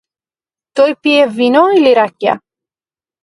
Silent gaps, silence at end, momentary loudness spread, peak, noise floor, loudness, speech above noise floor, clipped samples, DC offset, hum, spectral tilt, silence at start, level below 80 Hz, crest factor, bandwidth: none; 0.85 s; 9 LU; 0 dBFS; under -90 dBFS; -11 LUFS; over 80 dB; under 0.1%; under 0.1%; none; -5 dB/octave; 0.75 s; -64 dBFS; 14 dB; 11.5 kHz